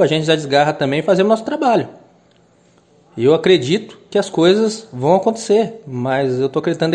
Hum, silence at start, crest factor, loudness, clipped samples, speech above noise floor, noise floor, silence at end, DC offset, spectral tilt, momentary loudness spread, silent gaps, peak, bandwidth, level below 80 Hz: none; 0 s; 16 dB; -16 LUFS; under 0.1%; 37 dB; -53 dBFS; 0 s; under 0.1%; -5.5 dB/octave; 7 LU; none; 0 dBFS; 10.5 kHz; -60 dBFS